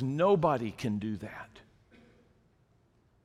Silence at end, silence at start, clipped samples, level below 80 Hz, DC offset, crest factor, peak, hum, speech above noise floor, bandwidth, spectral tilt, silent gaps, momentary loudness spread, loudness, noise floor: 1.65 s; 0 s; under 0.1%; -64 dBFS; under 0.1%; 20 dB; -14 dBFS; none; 38 dB; 12.5 kHz; -7.5 dB/octave; none; 20 LU; -30 LUFS; -68 dBFS